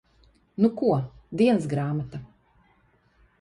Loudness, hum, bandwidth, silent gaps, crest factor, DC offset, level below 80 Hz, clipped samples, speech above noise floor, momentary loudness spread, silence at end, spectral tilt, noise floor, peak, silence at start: -25 LUFS; none; 11 kHz; none; 18 dB; under 0.1%; -58 dBFS; under 0.1%; 40 dB; 16 LU; 1.15 s; -8 dB/octave; -63 dBFS; -10 dBFS; 0.6 s